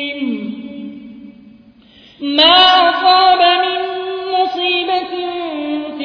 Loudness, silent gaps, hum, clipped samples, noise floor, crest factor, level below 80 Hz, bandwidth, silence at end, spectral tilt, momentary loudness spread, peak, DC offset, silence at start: -13 LUFS; none; none; under 0.1%; -45 dBFS; 16 dB; -56 dBFS; 5.4 kHz; 0 s; -4 dB/octave; 19 LU; 0 dBFS; under 0.1%; 0 s